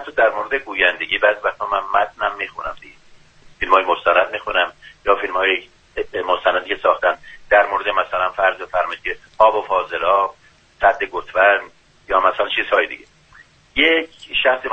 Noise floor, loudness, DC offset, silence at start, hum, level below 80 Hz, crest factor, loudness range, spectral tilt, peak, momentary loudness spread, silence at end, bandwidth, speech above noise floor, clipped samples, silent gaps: -50 dBFS; -18 LUFS; under 0.1%; 0 s; none; -48 dBFS; 18 dB; 2 LU; -4 dB/octave; 0 dBFS; 10 LU; 0 s; 8.2 kHz; 32 dB; under 0.1%; none